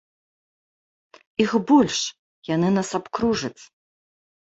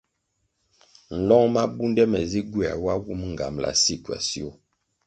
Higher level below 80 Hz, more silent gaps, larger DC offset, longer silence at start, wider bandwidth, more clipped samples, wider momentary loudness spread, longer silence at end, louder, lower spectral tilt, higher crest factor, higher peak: second, -58 dBFS vs -48 dBFS; first, 2.19-2.42 s vs none; neither; first, 1.4 s vs 1.1 s; second, 8.2 kHz vs 9.4 kHz; neither; about the same, 14 LU vs 12 LU; first, 0.85 s vs 0.55 s; about the same, -22 LUFS vs -23 LUFS; about the same, -5 dB/octave vs -4 dB/octave; about the same, 20 dB vs 20 dB; about the same, -4 dBFS vs -6 dBFS